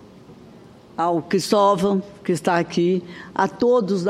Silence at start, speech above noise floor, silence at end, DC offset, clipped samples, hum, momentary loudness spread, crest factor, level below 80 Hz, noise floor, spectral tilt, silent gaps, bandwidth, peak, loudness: 0.3 s; 25 dB; 0 s; under 0.1%; under 0.1%; none; 8 LU; 16 dB; -60 dBFS; -45 dBFS; -6 dB/octave; none; 15 kHz; -4 dBFS; -21 LUFS